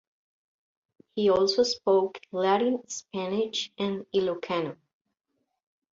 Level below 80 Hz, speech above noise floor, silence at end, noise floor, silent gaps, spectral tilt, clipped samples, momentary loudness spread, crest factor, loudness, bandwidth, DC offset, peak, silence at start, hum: -68 dBFS; 53 dB; 1.2 s; -79 dBFS; none; -4 dB/octave; under 0.1%; 10 LU; 18 dB; -27 LUFS; 7.6 kHz; under 0.1%; -10 dBFS; 1.15 s; none